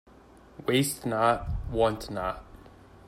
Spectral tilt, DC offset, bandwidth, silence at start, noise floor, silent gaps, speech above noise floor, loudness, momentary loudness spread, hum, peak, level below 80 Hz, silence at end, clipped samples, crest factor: -5 dB/octave; under 0.1%; 16 kHz; 0.55 s; -54 dBFS; none; 26 dB; -28 LUFS; 9 LU; none; -8 dBFS; -44 dBFS; 0.1 s; under 0.1%; 22 dB